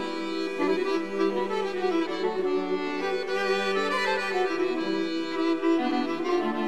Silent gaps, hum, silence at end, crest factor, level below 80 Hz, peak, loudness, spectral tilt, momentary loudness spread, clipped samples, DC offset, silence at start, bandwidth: none; none; 0 s; 14 dB; -70 dBFS; -12 dBFS; -27 LUFS; -4.5 dB/octave; 3 LU; under 0.1%; 0.7%; 0 s; 12 kHz